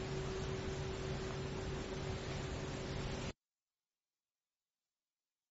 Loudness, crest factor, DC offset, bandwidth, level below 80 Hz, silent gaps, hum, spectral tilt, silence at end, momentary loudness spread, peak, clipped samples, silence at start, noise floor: -43 LUFS; 14 dB; under 0.1%; 8 kHz; -52 dBFS; none; none; -5 dB/octave; 2.2 s; 2 LU; -30 dBFS; under 0.1%; 0 s; under -90 dBFS